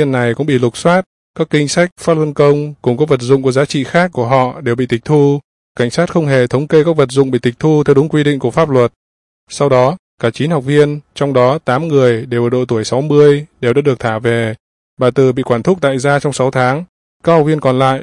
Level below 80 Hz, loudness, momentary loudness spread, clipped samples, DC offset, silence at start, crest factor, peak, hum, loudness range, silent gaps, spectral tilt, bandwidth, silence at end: -50 dBFS; -13 LUFS; 6 LU; under 0.1%; under 0.1%; 0 s; 12 dB; 0 dBFS; none; 2 LU; 1.06-1.34 s, 1.92-1.96 s, 5.44-5.75 s, 8.96-9.47 s, 9.99-10.18 s, 14.60-14.97 s, 16.89-17.20 s; -6.5 dB/octave; 11.5 kHz; 0 s